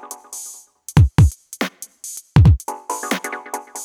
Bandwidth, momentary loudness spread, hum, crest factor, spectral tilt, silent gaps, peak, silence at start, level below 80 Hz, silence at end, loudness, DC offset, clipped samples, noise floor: 18.5 kHz; 19 LU; none; 18 dB; -6 dB/octave; none; 0 dBFS; 0.05 s; -26 dBFS; 0 s; -18 LUFS; under 0.1%; under 0.1%; -39 dBFS